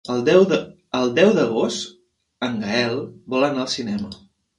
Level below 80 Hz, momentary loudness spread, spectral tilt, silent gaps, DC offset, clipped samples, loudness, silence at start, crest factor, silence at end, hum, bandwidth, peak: -58 dBFS; 13 LU; -5 dB/octave; none; under 0.1%; under 0.1%; -20 LUFS; 0.05 s; 20 dB; 0.4 s; none; 11.5 kHz; -2 dBFS